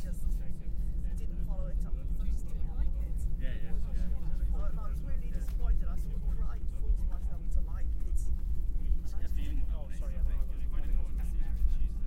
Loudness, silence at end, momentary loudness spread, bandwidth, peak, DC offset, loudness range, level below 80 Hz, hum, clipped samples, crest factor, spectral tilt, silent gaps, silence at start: -38 LUFS; 0 s; 4 LU; 3.4 kHz; -14 dBFS; under 0.1%; 1 LU; -32 dBFS; none; under 0.1%; 14 dB; -7.5 dB/octave; none; 0 s